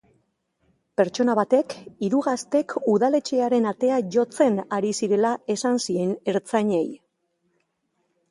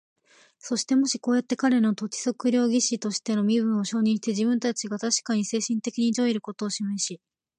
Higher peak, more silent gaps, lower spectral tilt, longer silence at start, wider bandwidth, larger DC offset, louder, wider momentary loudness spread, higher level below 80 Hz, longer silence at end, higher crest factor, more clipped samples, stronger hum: first, -6 dBFS vs -10 dBFS; neither; first, -5.5 dB/octave vs -4 dB/octave; first, 1 s vs 0.65 s; about the same, 11.5 kHz vs 10.5 kHz; neither; about the same, -23 LUFS vs -25 LUFS; about the same, 5 LU vs 7 LU; first, -70 dBFS vs -76 dBFS; first, 1.35 s vs 0.4 s; about the same, 18 dB vs 14 dB; neither; neither